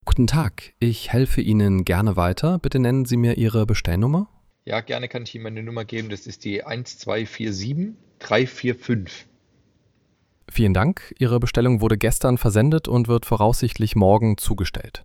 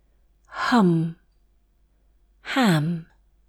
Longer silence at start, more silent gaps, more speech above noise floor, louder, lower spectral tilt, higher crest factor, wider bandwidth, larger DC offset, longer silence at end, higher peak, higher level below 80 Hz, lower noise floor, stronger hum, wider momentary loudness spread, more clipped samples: second, 0.05 s vs 0.5 s; neither; about the same, 44 dB vs 42 dB; about the same, -21 LUFS vs -22 LUFS; about the same, -6.5 dB/octave vs -6.5 dB/octave; about the same, 18 dB vs 18 dB; first, 16.5 kHz vs 13 kHz; neither; second, 0.05 s vs 0.45 s; first, -2 dBFS vs -8 dBFS; first, -32 dBFS vs -58 dBFS; about the same, -64 dBFS vs -62 dBFS; neither; second, 12 LU vs 16 LU; neither